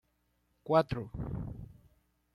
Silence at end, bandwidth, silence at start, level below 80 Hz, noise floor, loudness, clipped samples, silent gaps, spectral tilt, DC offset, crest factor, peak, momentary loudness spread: 0.65 s; 12.5 kHz; 0.65 s; -52 dBFS; -76 dBFS; -33 LUFS; under 0.1%; none; -8.5 dB/octave; under 0.1%; 24 dB; -12 dBFS; 22 LU